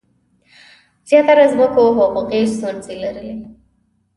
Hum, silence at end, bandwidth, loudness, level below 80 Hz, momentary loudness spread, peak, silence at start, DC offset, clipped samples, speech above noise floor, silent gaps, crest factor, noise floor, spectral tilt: none; 0.65 s; 11.5 kHz; -15 LUFS; -52 dBFS; 17 LU; 0 dBFS; 1.1 s; under 0.1%; under 0.1%; 47 dB; none; 16 dB; -61 dBFS; -5.5 dB/octave